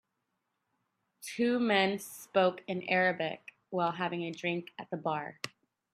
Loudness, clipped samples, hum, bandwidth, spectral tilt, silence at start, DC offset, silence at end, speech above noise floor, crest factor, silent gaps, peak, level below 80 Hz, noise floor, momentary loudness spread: -32 LUFS; under 0.1%; none; 15.5 kHz; -5 dB/octave; 1.2 s; under 0.1%; 0.45 s; 51 dB; 20 dB; none; -14 dBFS; -82 dBFS; -83 dBFS; 14 LU